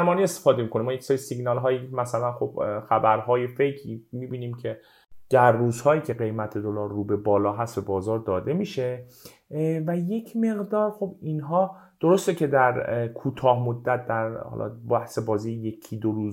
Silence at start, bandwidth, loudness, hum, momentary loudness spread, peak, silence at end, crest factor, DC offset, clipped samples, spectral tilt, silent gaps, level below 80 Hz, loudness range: 0 s; 16 kHz; -25 LUFS; none; 11 LU; -4 dBFS; 0 s; 20 dB; under 0.1%; under 0.1%; -7 dB/octave; none; -64 dBFS; 3 LU